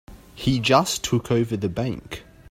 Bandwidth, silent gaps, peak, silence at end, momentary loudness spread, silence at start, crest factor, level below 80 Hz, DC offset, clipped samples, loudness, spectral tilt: 16.5 kHz; none; -4 dBFS; 0.3 s; 16 LU; 0.1 s; 20 dB; -46 dBFS; under 0.1%; under 0.1%; -22 LUFS; -5 dB/octave